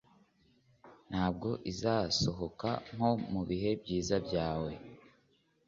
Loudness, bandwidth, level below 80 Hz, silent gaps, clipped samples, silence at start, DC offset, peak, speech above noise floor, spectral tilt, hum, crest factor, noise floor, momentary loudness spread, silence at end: -34 LUFS; 7.4 kHz; -56 dBFS; none; under 0.1%; 0.85 s; under 0.1%; -16 dBFS; 38 dB; -5 dB/octave; none; 20 dB; -72 dBFS; 7 LU; 0.65 s